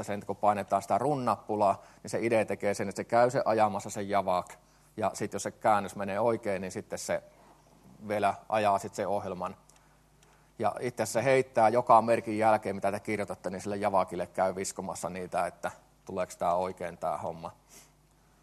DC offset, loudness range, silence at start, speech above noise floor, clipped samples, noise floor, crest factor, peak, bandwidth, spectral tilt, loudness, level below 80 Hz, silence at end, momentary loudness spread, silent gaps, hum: under 0.1%; 6 LU; 0 s; 34 dB; under 0.1%; -63 dBFS; 22 dB; -8 dBFS; 13 kHz; -5 dB/octave; -30 LUFS; -68 dBFS; 0.65 s; 11 LU; none; none